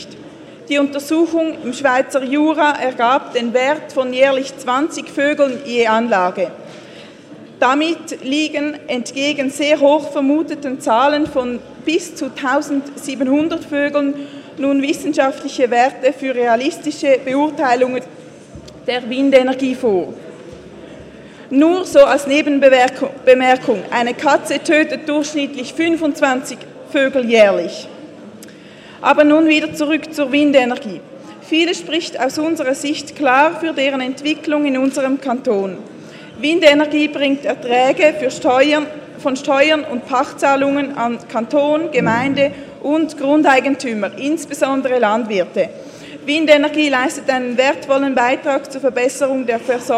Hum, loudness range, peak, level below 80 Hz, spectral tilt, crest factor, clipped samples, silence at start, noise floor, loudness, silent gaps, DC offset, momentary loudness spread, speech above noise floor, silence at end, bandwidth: none; 4 LU; 0 dBFS; -58 dBFS; -4 dB/octave; 16 dB; under 0.1%; 0 s; -38 dBFS; -16 LUFS; none; under 0.1%; 12 LU; 23 dB; 0 s; 13.5 kHz